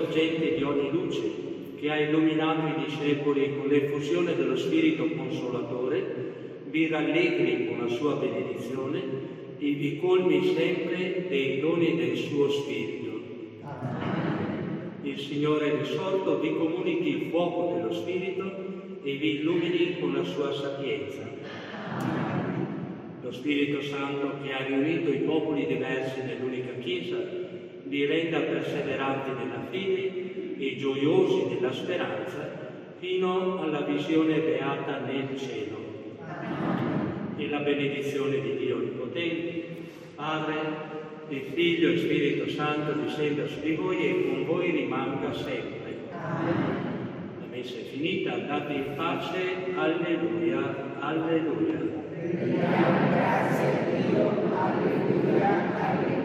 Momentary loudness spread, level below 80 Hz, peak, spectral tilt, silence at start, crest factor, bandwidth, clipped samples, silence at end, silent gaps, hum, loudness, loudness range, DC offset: 12 LU; -70 dBFS; -10 dBFS; -7 dB/octave; 0 s; 18 dB; 13 kHz; under 0.1%; 0 s; none; none; -28 LUFS; 5 LU; under 0.1%